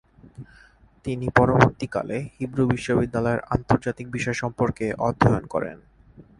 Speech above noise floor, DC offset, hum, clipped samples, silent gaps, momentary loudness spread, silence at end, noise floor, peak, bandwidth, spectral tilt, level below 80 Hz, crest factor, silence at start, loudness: 27 dB; under 0.1%; none; under 0.1%; none; 11 LU; 0.15 s; -50 dBFS; 0 dBFS; 11 kHz; -7 dB/octave; -44 dBFS; 24 dB; 0.4 s; -23 LUFS